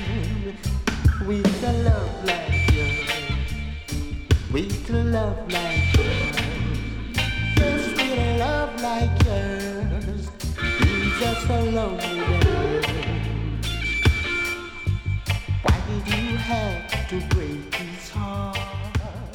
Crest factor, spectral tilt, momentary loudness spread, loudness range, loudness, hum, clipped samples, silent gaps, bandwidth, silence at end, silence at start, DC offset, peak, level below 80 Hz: 18 dB; -5.5 dB/octave; 8 LU; 2 LU; -24 LUFS; none; under 0.1%; none; 18 kHz; 0 s; 0 s; under 0.1%; -6 dBFS; -30 dBFS